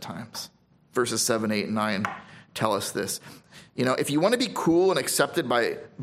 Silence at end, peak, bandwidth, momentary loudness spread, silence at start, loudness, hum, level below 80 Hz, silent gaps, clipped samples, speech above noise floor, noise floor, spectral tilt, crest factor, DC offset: 0 s; -6 dBFS; 16 kHz; 14 LU; 0 s; -25 LUFS; none; -66 dBFS; none; under 0.1%; 30 dB; -56 dBFS; -3.5 dB/octave; 20 dB; under 0.1%